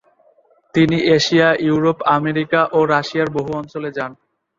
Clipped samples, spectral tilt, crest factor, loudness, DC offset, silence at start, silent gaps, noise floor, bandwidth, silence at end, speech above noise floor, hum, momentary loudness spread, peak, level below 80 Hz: under 0.1%; -5.5 dB/octave; 16 dB; -17 LUFS; under 0.1%; 0.75 s; none; -55 dBFS; 7.6 kHz; 0.45 s; 39 dB; none; 11 LU; -2 dBFS; -54 dBFS